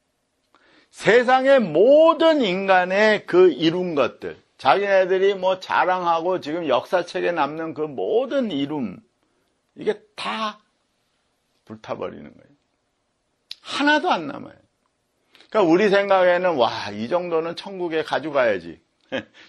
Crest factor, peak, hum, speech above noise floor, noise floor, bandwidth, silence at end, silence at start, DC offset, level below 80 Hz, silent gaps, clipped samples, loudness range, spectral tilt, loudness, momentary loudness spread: 20 dB; 0 dBFS; none; 51 dB; -71 dBFS; 11 kHz; 0.25 s; 0.95 s; under 0.1%; -68 dBFS; none; under 0.1%; 15 LU; -5.5 dB/octave; -20 LUFS; 15 LU